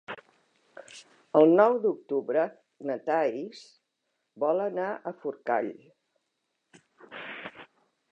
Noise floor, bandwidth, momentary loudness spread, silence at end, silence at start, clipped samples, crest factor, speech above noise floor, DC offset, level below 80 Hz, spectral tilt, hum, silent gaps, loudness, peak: -80 dBFS; 9.4 kHz; 24 LU; 0.5 s; 0.1 s; under 0.1%; 22 dB; 54 dB; under 0.1%; -86 dBFS; -6.5 dB/octave; none; none; -27 LUFS; -8 dBFS